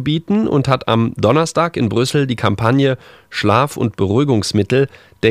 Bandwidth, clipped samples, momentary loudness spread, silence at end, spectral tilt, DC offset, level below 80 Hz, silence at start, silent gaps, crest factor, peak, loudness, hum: 15 kHz; under 0.1%; 4 LU; 0 s; -6 dB/octave; under 0.1%; -46 dBFS; 0 s; none; 16 dB; 0 dBFS; -16 LUFS; none